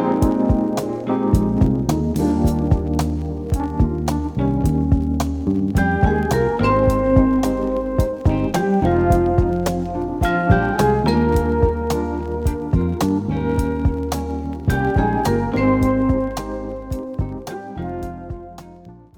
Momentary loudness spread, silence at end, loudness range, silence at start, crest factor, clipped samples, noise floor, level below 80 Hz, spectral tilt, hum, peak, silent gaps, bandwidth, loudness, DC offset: 11 LU; 0.2 s; 3 LU; 0 s; 18 dB; under 0.1%; -42 dBFS; -28 dBFS; -7.5 dB/octave; none; 0 dBFS; none; 20 kHz; -19 LUFS; under 0.1%